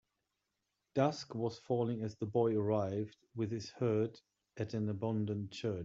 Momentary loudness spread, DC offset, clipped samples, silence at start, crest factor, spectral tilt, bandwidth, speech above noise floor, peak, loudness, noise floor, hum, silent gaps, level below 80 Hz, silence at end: 8 LU; under 0.1%; under 0.1%; 0.95 s; 20 dB; -7.5 dB/octave; 7.8 kHz; 50 dB; -18 dBFS; -37 LUFS; -86 dBFS; none; none; -76 dBFS; 0 s